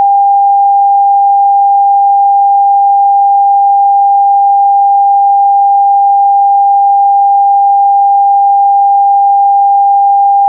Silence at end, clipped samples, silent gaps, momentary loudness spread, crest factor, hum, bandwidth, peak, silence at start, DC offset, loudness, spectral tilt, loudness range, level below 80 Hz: 0 s; under 0.1%; none; 0 LU; 4 dB; none; 1 kHz; -2 dBFS; 0 s; under 0.1%; -7 LUFS; -7 dB/octave; 0 LU; under -90 dBFS